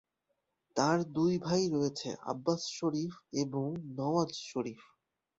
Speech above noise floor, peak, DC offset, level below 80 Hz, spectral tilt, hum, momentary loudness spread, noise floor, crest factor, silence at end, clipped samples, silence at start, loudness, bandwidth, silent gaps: 50 dB; -12 dBFS; under 0.1%; -72 dBFS; -5.5 dB/octave; none; 9 LU; -83 dBFS; 22 dB; 0.6 s; under 0.1%; 0.75 s; -34 LUFS; 8 kHz; none